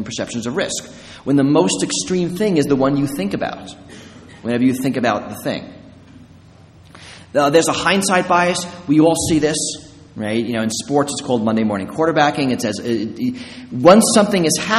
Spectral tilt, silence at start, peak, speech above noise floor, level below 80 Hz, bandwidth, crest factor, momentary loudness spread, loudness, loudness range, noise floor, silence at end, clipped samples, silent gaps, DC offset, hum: -4.5 dB/octave; 0 s; 0 dBFS; 27 dB; -50 dBFS; 13.5 kHz; 18 dB; 13 LU; -17 LUFS; 6 LU; -44 dBFS; 0 s; under 0.1%; none; under 0.1%; none